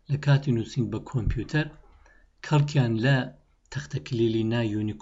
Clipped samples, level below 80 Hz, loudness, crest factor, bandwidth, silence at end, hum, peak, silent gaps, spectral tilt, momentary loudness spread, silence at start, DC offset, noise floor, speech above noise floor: under 0.1%; -44 dBFS; -26 LUFS; 16 dB; 7.8 kHz; 0 s; none; -10 dBFS; none; -7 dB/octave; 12 LU; 0.1 s; under 0.1%; -56 dBFS; 31 dB